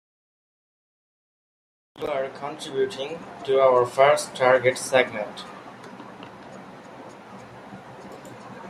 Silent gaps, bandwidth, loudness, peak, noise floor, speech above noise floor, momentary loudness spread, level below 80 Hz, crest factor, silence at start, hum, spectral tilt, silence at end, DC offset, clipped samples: none; 15 kHz; -23 LUFS; -4 dBFS; -43 dBFS; 21 dB; 24 LU; -68 dBFS; 22 dB; 1.95 s; none; -3.5 dB/octave; 0 s; under 0.1%; under 0.1%